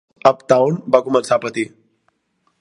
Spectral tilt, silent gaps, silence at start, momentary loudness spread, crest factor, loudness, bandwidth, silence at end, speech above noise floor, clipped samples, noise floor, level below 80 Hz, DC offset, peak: -5.5 dB/octave; none; 0.25 s; 10 LU; 18 dB; -17 LUFS; 11.5 kHz; 0.95 s; 50 dB; under 0.1%; -66 dBFS; -62 dBFS; under 0.1%; 0 dBFS